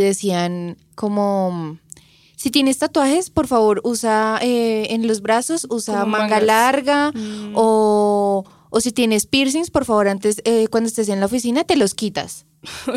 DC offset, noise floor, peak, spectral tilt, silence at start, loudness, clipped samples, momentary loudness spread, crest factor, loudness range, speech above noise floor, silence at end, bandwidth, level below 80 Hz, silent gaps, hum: under 0.1%; -45 dBFS; -2 dBFS; -4 dB/octave; 0 s; -18 LUFS; under 0.1%; 9 LU; 16 dB; 2 LU; 28 dB; 0 s; 16 kHz; -52 dBFS; none; none